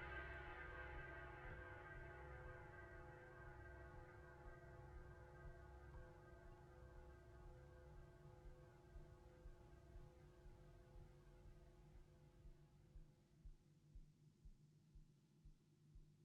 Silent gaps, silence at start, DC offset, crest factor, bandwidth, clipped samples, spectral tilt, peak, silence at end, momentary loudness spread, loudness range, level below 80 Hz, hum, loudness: none; 0 s; under 0.1%; 20 dB; 8.8 kHz; under 0.1%; -6.5 dB/octave; -42 dBFS; 0 s; 14 LU; 10 LU; -66 dBFS; none; -62 LUFS